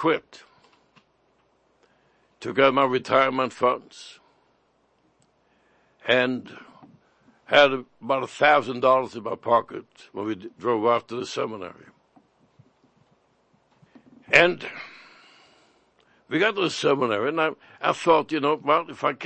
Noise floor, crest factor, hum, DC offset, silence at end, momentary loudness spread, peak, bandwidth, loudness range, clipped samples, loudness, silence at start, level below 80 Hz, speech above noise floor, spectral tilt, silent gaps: -66 dBFS; 24 dB; none; under 0.1%; 0 s; 18 LU; 0 dBFS; 8.8 kHz; 8 LU; under 0.1%; -23 LUFS; 0 s; -68 dBFS; 43 dB; -4.5 dB/octave; none